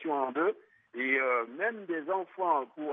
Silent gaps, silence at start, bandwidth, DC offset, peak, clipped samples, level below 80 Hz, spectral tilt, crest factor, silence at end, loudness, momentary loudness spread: none; 0 s; 3.8 kHz; under 0.1%; -16 dBFS; under 0.1%; under -90 dBFS; -7.5 dB/octave; 16 dB; 0 s; -31 LUFS; 8 LU